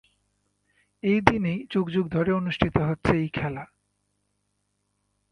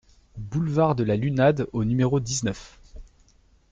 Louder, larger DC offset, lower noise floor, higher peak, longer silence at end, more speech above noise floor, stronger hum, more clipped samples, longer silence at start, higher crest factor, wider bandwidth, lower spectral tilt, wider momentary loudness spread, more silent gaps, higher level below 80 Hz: about the same, -25 LUFS vs -24 LUFS; neither; first, -75 dBFS vs -59 dBFS; first, 0 dBFS vs -8 dBFS; first, 1.65 s vs 0.65 s; first, 51 dB vs 36 dB; first, 50 Hz at -50 dBFS vs none; neither; first, 1.05 s vs 0.35 s; first, 26 dB vs 18 dB; first, 10.5 kHz vs 9.4 kHz; first, -7.5 dB/octave vs -6 dB/octave; about the same, 9 LU vs 10 LU; neither; about the same, -46 dBFS vs -48 dBFS